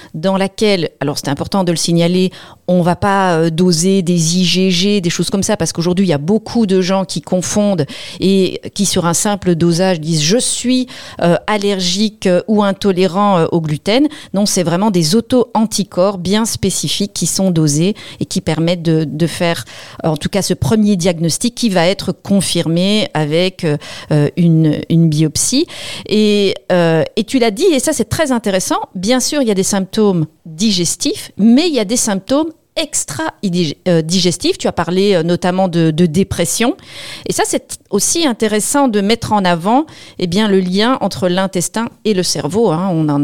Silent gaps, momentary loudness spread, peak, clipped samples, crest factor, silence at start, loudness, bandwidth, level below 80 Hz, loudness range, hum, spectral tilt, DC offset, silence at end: none; 6 LU; 0 dBFS; under 0.1%; 14 dB; 0 s; -14 LUFS; 17 kHz; -46 dBFS; 2 LU; none; -4.5 dB/octave; 1%; 0 s